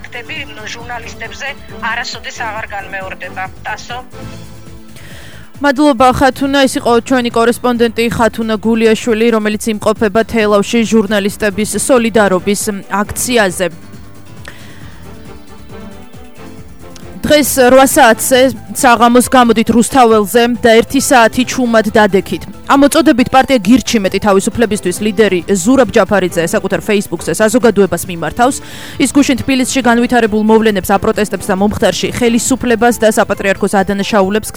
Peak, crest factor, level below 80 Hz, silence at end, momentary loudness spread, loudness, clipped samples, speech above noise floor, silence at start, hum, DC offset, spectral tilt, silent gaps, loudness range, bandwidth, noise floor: 0 dBFS; 12 dB; -38 dBFS; 0.05 s; 15 LU; -11 LUFS; 0.2%; 23 dB; 0 s; none; 2%; -4 dB/octave; none; 13 LU; over 20 kHz; -34 dBFS